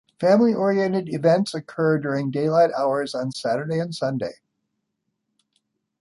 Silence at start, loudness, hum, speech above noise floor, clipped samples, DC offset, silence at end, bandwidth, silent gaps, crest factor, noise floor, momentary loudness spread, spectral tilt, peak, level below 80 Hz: 0.2 s; -22 LUFS; none; 56 dB; under 0.1%; under 0.1%; 1.7 s; 11.5 kHz; none; 16 dB; -77 dBFS; 9 LU; -7 dB/octave; -6 dBFS; -68 dBFS